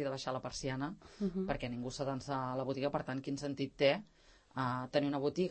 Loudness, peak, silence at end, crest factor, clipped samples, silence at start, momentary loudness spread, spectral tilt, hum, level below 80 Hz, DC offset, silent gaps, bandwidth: -38 LUFS; -18 dBFS; 0 s; 20 dB; under 0.1%; 0 s; 8 LU; -5.5 dB/octave; none; -60 dBFS; under 0.1%; none; 8.4 kHz